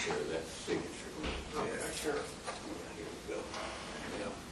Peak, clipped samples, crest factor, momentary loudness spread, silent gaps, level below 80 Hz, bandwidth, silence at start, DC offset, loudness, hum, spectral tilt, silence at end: -22 dBFS; under 0.1%; 18 dB; 6 LU; none; -54 dBFS; 13 kHz; 0 s; under 0.1%; -40 LUFS; none; -3.5 dB/octave; 0 s